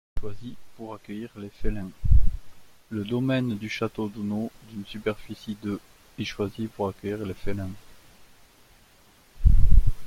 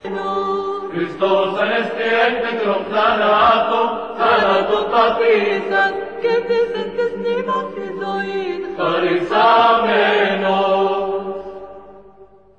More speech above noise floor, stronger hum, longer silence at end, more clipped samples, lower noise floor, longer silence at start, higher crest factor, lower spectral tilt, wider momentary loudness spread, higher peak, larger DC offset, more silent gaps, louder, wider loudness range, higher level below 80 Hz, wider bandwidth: about the same, 31 dB vs 31 dB; neither; second, 0 s vs 0.35 s; neither; first, -57 dBFS vs -46 dBFS; first, 0.15 s vs 0 s; about the same, 20 dB vs 16 dB; first, -7.5 dB/octave vs -5.5 dB/octave; first, 16 LU vs 10 LU; about the same, -4 dBFS vs -2 dBFS; second, under 0.1% vs 0.4%; neither; second, -30 LUFS vs -17 LUFS; about the same, 5 LU vs 4 LU; first, -28 dBFS vs -54 dBFS; second, 6.8 kHz vs 8.2 kHz